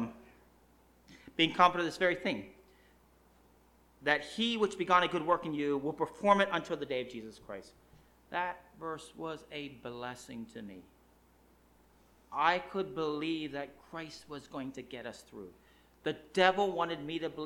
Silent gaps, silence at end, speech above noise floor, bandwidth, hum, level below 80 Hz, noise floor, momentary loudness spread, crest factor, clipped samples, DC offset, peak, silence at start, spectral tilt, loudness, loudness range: none; 0 s; 31 dB; 18.5 kHz; none; -68 dBFS; -65 dBFS; 19 LU; 26 dB; under 0.1%; under 0.1%; -8 dBFS; 0 s; -4.5 dB/octave; -33 LUFS; 11 LU